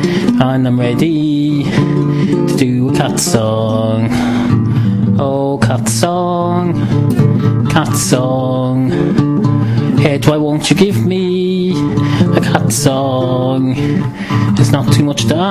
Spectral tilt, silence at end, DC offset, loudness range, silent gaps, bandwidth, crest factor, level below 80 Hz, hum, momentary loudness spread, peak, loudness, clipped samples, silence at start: -6 dB/octave; 0 s; under 0.1%; 1 LU; none; 15.5 kHz; 12 dB; -38 dBFS; none; 3 LU; 0 dBFS; -13 LUFS; under 0.1%; 0 s